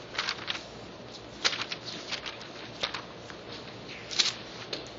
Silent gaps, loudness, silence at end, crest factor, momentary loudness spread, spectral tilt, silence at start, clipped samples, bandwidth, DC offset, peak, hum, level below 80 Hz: none; -33 LUFS; 0 s; 30 dB; 16 LU; 0 dB/octave; 0 s; under 0.1%; 8 kHz; under 0.1%; -6 dBFS; none; -62 dBFS